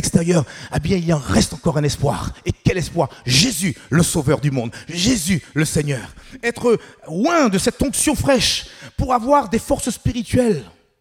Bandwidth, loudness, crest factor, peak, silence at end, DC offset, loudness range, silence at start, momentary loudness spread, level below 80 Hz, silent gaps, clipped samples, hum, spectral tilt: 17.5 kHz; -19 LUFS; 18 dB; 0 dBFS; 0.3 s; under 0.1%; 2 LU; 0 s; 9 LU; -36 dBFS; none; under 0.1%; none; -4.5 dB/octave